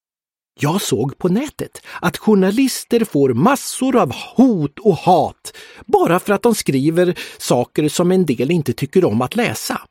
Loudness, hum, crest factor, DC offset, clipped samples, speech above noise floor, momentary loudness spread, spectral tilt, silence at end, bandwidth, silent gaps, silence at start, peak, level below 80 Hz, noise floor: -17 LUFS; none; 16 dB; under 0.1%; under 0.1%; over 74 dB; 8 LU; -5.5 dB/octave; 0.05 s; 17 kHz; none; 0.6 s; 0 dBFS; -52 dBFS; under -90 dBFS